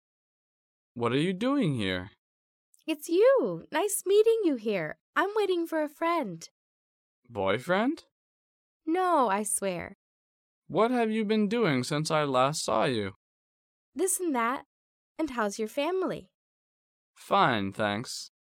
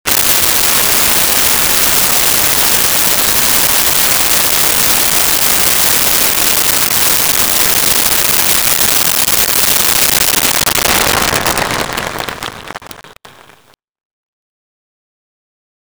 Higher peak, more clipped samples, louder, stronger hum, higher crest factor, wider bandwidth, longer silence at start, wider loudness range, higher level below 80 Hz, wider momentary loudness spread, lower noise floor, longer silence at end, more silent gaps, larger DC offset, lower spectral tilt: second, -10 dBFS vs 0 dBFS; neither; second, -28 LUFS vs -8 LUFS; neither; first, 18 dB vs 12 dB; second, 17 kHz vs over 20 kHz; first, 0.95 s vs 0.05 s; second, 5 LU vs 8 LU; second, -70 dBFS vs -36 dBFS; first, 14 LU vs 6 LU; first, under -90 dBFS vs -48 dBFS; second, 0.3 s vs 2.75 s; first, 2.18-2.73 s, 5.00-5.13 s, 6.51-7.23 s, 8.11-8.80 s, 9.95-10.62 s, 13.16-13.93 s, 14.66-15.15 s, 16.34-17.14 s vs none; neither; first, -4.5 dB/octave vs -0.5 dB/octave